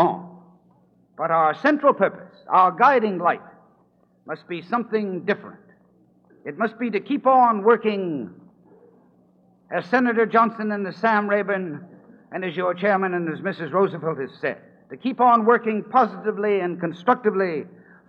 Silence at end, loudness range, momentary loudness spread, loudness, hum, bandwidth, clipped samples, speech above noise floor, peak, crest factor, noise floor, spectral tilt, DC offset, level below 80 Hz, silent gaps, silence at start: 0.4 s; 5 LU; 15 LU; -21 LUFS; none; 6.6 kHz; under 0.1%; 39 dB; -2 dBFS; 20 dB; -60 dBFS; -8 dB/octave; under 0.1%; -78 dBFS; none; 0 s